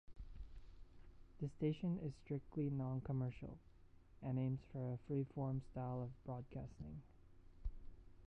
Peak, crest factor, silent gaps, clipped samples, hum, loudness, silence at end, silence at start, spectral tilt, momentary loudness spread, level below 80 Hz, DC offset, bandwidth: -28 dBFS; 18 dB; none; under 0.1%; none; -46 LUFS; 0 s; 0.1 s; -10 dB/octave; 18 LU; -60 dBFS; under 0.1%; 6.2 kHz